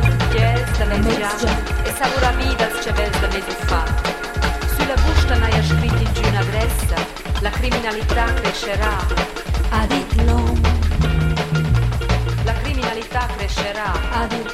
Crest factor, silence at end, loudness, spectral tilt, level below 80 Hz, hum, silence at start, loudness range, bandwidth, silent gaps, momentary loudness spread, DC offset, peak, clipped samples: 16 dB; 0 s; -19 LUFS; -5.5 dB/octave; -22 dBFS; none; 0 s; 2 LU; 15.5 kHz; none; 5 LU; under 0.1%; -2 dBFS; under 0.1%